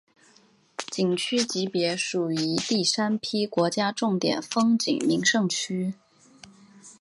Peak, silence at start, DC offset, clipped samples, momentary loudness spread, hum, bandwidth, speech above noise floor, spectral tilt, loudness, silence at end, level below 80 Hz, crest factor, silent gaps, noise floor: -8 dBFS; 0.8 s; under 0.1%; under 0.1%; 8 LU; none; 11.5 kHz; 35 dB; -4 dB/octave; -25 LUFS; 0.1 s; -72 dBFS; 18 dB; none; -60 dBFS